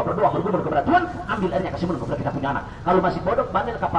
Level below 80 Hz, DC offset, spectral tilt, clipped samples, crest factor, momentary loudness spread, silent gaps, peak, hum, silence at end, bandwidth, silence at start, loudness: -42 dBFS; under 0.1%; -8 dB/octave; under 0.1%; 16 dB; 6 LU; none; -6 dBFS; none; 0 s; 10.5 kHz; 0 s; -23 LUFS